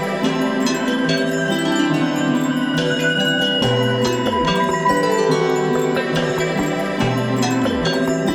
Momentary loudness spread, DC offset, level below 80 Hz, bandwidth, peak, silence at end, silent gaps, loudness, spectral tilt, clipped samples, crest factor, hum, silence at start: 3 LU; 0.2%; -46 dBFS; 18 kHz; -4 dBFS; 0 s; none; -18 LUFS; -5 dB/octave; under 0.1%; 14 dB; none; 0 s